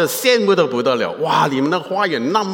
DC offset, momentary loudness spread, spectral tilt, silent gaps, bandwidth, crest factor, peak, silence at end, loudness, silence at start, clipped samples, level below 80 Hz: under 0.1%; 5 LU; -4 dB/octave; none; 17 kHz; 14 dB; -2 dBFS; 0 s; -17 LUFS; 0 s; under 0.1%; -72 dBFS